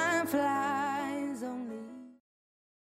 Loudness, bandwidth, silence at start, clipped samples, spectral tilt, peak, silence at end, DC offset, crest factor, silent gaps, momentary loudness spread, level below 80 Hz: -33 LUFS; 15.5 kHz; 0 s; under 0.1%; -4 dB/octave; -18 dBFS; 0.85 s; under 0.1%; 16 dB; none; 16 LU; -78 dBFS